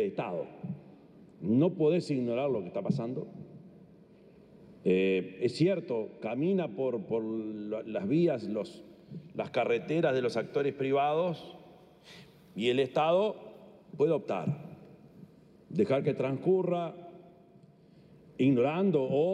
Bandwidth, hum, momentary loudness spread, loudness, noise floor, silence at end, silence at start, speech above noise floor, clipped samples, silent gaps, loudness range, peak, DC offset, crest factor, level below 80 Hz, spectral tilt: 10 kHz; none; 18 LU; -31 LUFS; -58 dBFS; 0 s; 0 s; 28 dB; under 0.1%; none; 2 LU; -16 dBFS; under 0.1%; 16 dB; -76 dBFS; -7.5 dB/octave